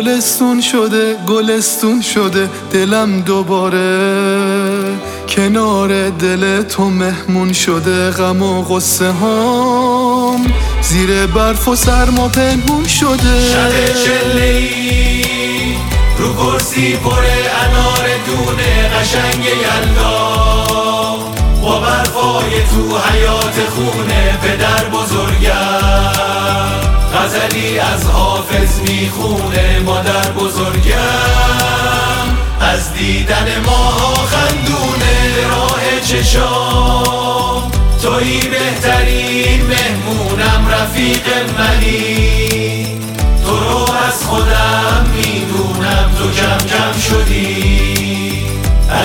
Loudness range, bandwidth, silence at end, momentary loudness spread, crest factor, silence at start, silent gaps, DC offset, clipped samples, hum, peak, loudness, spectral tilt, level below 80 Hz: 2 LU; 18.5 kHz; 0 s; 3 LU; 12 dB; 0 s; none; under 0.1%; under 0.1%; none; 0 dBFS; -12 LUFS; -4 dB/octave; -18 dBFS